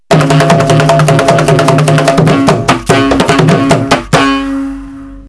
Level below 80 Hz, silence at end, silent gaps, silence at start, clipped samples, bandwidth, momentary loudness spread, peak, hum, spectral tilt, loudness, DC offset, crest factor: -32 dBFS; 0 s; none; 0.1 s; 3%; 11 kHz; 7 LU; 0 dBFS; none; -5.5 dB/octave; -8 LUFS; 0.4%; 8 dB